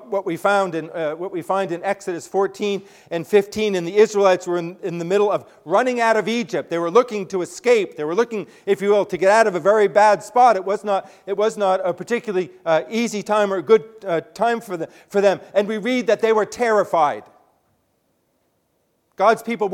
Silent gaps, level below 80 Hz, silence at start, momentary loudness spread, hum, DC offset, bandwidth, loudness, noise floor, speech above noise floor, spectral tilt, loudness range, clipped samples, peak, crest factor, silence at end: none; -66 dBFS; 0 s; 10 LU; none; under 0.1%; 15.5 kHz; -20 LUFS; -67 dBFS; 48 dB; -5 dB/octave; 5 LU; under 0.1%; 0 dBFS; 20 dB; 0 s